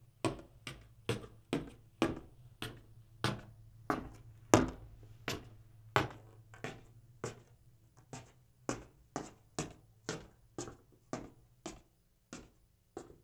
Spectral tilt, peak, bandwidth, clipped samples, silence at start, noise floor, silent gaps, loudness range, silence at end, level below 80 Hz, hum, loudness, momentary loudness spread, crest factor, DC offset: -4.5 dB/octave; -6 dBFS; over 20 kHz; under 0.1%; 0 s; -71 dBFS; none; 11 LU; 0.15 s; -60 dBFS; none; -40 LUFS; 22 LU; 36 dB; under 0.1%